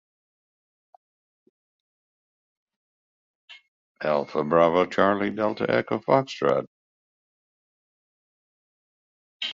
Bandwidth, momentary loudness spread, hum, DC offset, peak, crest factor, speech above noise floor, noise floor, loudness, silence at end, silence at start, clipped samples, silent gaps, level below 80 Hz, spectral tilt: 7.6 kHz; 8 LU; none; under 0.1%; -4 dBFS; 24 dB; over 67 dB; under -90 dBFS; -24 LUFS; 0 s; 3.5 s; under 0.1%; 3.68-3.95 s, 6.67-9.40 s; -64 dBFS; -6.5 dB/octave